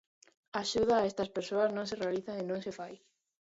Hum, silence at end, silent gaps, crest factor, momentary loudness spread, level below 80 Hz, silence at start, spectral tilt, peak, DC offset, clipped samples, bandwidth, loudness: none; 0.45 s; none; 18 dB; 12 LU; -64 dBFS; 0.55 s; -4.5 dB/octave; -16 dBFS; under 0.1%; under 0.1%; 8 kHz; -33 LUFS